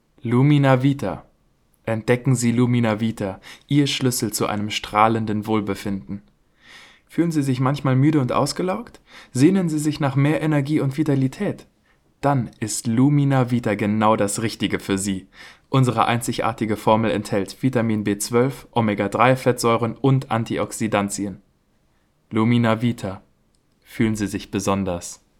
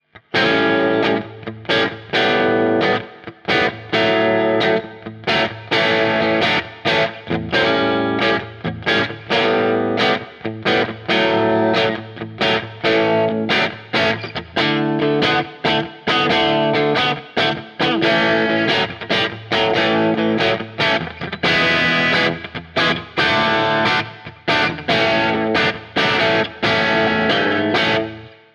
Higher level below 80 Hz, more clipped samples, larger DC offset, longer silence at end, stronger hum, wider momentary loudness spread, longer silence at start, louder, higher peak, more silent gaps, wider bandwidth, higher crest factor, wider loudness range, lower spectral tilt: about the same, -52 dBFS vs -50 dBFS; neither; neither; about the same, 0.25 s vs 0.25 s; neither; first, 11 LU vs 6 LU; about the same, 0.25 s vs 0.15 s; second, -21 LUFS vs -17 LUFS; about the same, -2 dBFS vs -4 dBFS; neither; first, 16 kHz vs 10.5 kHz; first, 20 dB vs 14 dB; about the same, 3 LU vs 2 LU; about the same, -6 dB/octave vs -5.5 dB/octave